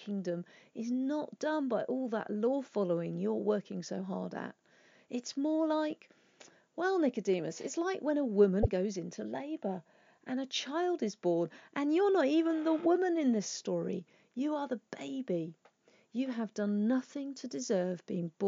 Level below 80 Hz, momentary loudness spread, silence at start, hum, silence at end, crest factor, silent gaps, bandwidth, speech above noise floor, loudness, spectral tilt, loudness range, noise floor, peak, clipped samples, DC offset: -56 dBFS; 12 LU; 0 s; none; 0 s; 20 dB; none; 7.6 kHz; 33 dB; -34 LUFS; -5.5 dB/octave; 5 LU; -67 dBFS; -14 dBFS; under 0.1%; under 0.1%